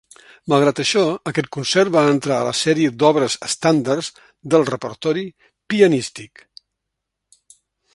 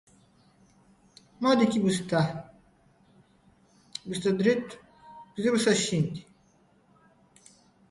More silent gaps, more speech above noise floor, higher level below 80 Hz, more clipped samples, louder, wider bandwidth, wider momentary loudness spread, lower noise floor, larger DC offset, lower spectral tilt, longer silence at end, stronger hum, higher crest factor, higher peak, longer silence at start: neither; first, 62 dB vs 38 dB; about the same, -62 dBFS vs -66 dBFS; neither; first, -18 LUFS vs -26 LUFS; about the same, 11.5 kHz vs 11.5 kHz; second, 10 LU vs 19 LU; first, -80 dBFS vs -63 dBFS; neither; about the same, -4.5 dB/octave vs -5 dB/octave; about the same, 1.7 s vs 1.7 s; neither; about the same, 18 dB vs 20 dB; first, 0 dBFS vs -10 dBFS; second, 0.45 s vs 1.4 s